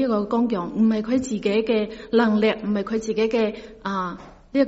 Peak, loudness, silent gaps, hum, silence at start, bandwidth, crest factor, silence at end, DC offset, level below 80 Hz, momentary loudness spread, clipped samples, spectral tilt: -6 dBFS; -23 LUFS; none; none; 0 s; 8 kHz; 16 dB; 0 s; under 0.1%; -52 dBFS; 8 LU; under 0.1%; -5 dB/octave